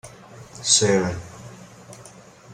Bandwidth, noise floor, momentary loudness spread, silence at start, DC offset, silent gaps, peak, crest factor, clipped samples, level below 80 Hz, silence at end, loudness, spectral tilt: 14.5 kHz; -46 dBFS; 27 LU; 0.05 s; under 0.1%; none; -2 dBFS; 24 dB; under 0.1%; -56 dBFS; 0 s; -19 LUFS; -2.5 dB/octave